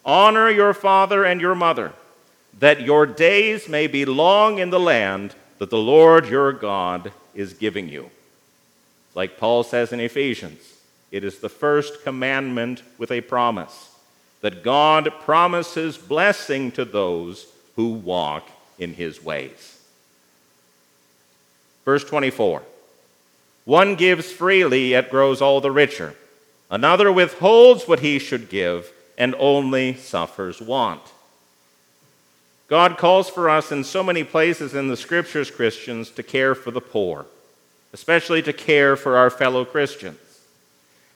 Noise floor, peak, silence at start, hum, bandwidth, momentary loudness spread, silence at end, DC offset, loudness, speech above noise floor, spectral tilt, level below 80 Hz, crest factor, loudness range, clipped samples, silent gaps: -59 dBFS; 0 dBFS; 0.05 s; 60 Hz at -55 dBFS; 15.5 kHz; 17 LU; 1 s; under 0.1%; -18 LUFS; 41 dB; -5 dB/octave; -72 dBFS; 20 dB; 10 LU; under 0.1%; none